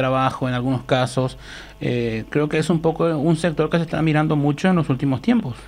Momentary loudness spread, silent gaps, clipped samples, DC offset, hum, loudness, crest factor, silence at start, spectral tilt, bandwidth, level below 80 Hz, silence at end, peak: 6 LU; none; under 0.1%; under 0.1%; none; -20 LUFS; 16 dB; 0 s; -7 dB/octave; 11.5 kHz; -44 dBFS; 0 s; -4 dBFS